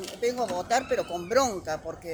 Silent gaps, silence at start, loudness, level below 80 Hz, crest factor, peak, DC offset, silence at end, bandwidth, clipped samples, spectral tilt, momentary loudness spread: none; 0 s; -28 LUFS; -56 dBFS; 16 dB; -12 dBFS; under 0.1%; 0 s; over 20 kHz; under 0.1%; -3 dB/octave; 8 LU